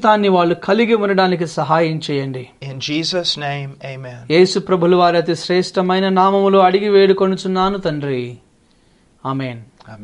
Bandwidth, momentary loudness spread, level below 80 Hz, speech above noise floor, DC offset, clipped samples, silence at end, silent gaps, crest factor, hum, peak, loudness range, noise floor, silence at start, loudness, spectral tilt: 10.5 kHz; 16 LU; -52 dBFS; 38 dB; under 0.1%; under 0.1%; 0 s; none; 16 dB; none; 0 dBFS; 5 LU; -54 dBFS; 0 s; -16 LUFS; -6 dB/octave